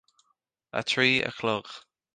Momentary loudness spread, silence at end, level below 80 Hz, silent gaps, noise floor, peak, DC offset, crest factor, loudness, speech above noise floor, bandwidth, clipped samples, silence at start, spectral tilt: 20 LU; 0.35 s; -66 dBFS; none; -75 dBFS; -8 dBFS; under 0.1%; 22 dB; -26 LUFS; 48 dB; 10 kHz; under 0.1%; 0.75 s; -4 dB/octave